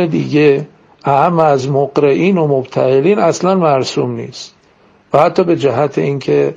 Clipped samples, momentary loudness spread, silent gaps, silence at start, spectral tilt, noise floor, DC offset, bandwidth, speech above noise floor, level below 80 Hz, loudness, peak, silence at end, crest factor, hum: under 0.1%; 10 LU; none; 0 s; -6.5 dB/octave; -49 dBFS; under 0.1%; 7.8 kHz; 37 dB; -56 dBFS; -13 LUFS; 0 dBFS; 0 s; 12 dB; none